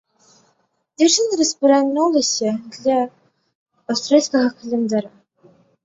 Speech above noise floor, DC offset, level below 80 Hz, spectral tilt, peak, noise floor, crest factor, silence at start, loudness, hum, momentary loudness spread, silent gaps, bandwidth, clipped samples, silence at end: 48 dB; under 0.1%; -66 dBFS; -3 dB/octave; -2 dBFS; -65 dBFS; 18 dB; 1 s; -18 LUFS; none; 9 LU; 3.55-3.66 s; 8 kHz; under 0.1%; 0.75 s